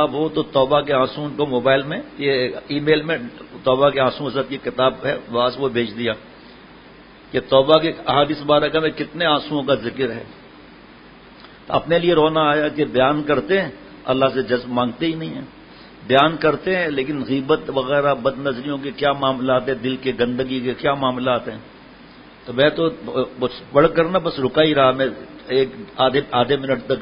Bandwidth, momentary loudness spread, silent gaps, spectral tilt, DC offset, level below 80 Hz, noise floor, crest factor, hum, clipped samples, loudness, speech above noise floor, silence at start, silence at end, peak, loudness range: 5.4 kHz; 9 LU; none; -9 dB/octave; under 0.1%; -50 dBFS; -44 dBFS; 20 dB; none; under 0.1%; -19 LUFS; 25 dB; 0 s; 0 s; 0 dBFS; 3 LU